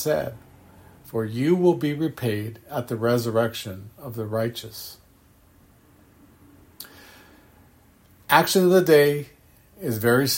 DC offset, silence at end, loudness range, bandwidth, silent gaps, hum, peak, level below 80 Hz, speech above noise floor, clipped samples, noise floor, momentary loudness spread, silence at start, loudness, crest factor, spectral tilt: under 0.1%; 0 s; 13 LU; 16.5 kHz; none; none; -2 dBFS; -60 dBFS; 34 dB; under 0.1%; -56 dBFS; 21 LU; 0 s; -22 LUFS; 22 dB; -5 dB/octave